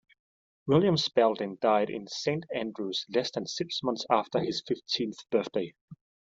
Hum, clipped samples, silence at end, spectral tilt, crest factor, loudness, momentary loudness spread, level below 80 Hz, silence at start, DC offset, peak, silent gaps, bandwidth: none; under 0.1%; 0.45 s; -5 dB/octave; 22 dB; -29 LUFS; 9 LU; -70 dBFS; 0.65 s; under 0.1%; -8 dBFS; 5.81-5.88 s; 7.8 kHz